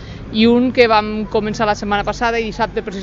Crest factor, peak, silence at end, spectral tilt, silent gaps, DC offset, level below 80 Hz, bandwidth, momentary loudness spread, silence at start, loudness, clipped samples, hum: 16 dB; 0 dBFS; 0 s; -5.5 dB/octave; none; under 0.1%; -36 dBFS; 7.6 kHz; 8 LU; 0 s; -16 LUFS; under 0.1%; none